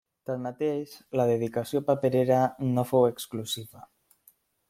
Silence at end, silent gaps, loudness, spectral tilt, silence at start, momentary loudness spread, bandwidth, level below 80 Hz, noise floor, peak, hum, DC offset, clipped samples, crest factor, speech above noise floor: 0.85 s; none; -27 LUFS; -6.5 dB/octave; 0.3 s; 11 LU; 16.5 kHz; -68 dBFS; -63 dBFS; -10 dBFS; none; under 0.1%; under 0.1%; 18 dB; 37 dB